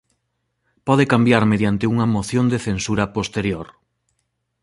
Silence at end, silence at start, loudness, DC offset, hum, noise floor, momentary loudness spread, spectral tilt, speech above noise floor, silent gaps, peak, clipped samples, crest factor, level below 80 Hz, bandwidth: 1 s; 0.85 s; -19 LUFS; under 0.1%; none; -73 dBFS; 10 LU; -6 dB/octave; 55 dB; none; -2 dBFS; under 0.1%; 18 dB; -46 dBFS; 11.5 kHz